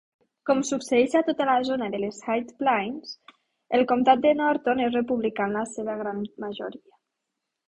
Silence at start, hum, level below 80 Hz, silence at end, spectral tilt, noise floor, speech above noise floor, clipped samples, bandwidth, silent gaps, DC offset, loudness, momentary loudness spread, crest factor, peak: 0.45 s; none; -66 dBFS; 0.95 s; -4.5 dB/octave; -83 dBFS; 58 dB; under 0.1%; 11.5 kHz; none; under 0.1%; -25 LUFS; 14 LU; 20 dB; -6 dBFS